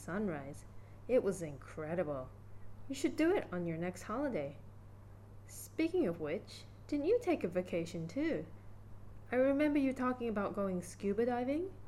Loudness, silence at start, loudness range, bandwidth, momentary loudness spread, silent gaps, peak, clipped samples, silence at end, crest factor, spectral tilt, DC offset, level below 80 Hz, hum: -37 LUFS; 0 s; 4 LU; 14.5 kHz; 23 LU; none; -20 dBFS; under 0.1%; 0 s; 16 dB; -6.5 dB/octave; under 0.1%; -60 dBFS; none